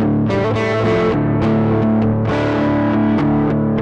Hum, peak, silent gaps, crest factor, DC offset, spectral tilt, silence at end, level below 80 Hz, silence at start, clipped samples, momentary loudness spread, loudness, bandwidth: none; -6 dBFS; none; 8 dB; under 0.1%; -8.5 dB/octave; 0 s; -36 dBFS; 0 s; under 0.1%; 2 LU; -16 LUFS; 7.8 kHz